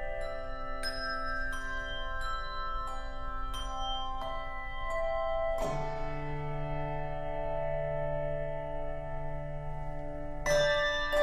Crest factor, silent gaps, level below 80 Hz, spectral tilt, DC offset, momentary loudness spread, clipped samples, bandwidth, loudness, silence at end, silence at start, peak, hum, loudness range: 18 dB; none; -38 dBFS; -4.5 dB/octave; under 0.1%; 10 LU; under 0.1%; 14 kHz; -35 LUFS; 0 s; 0 s; -16 dBFS; none; 3 LU